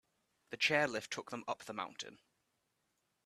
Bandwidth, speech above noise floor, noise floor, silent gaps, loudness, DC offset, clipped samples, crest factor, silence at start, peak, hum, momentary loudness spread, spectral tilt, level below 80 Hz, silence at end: 14 kHz; 44 dB; -83 dBFS; none; -37 LUFS; under 0.1%; under 0.1%; 24 dB; 0.5 s; -16 dBFS; none; 17 LU; -3 dB/octave; -82 dBFS; 1.1 s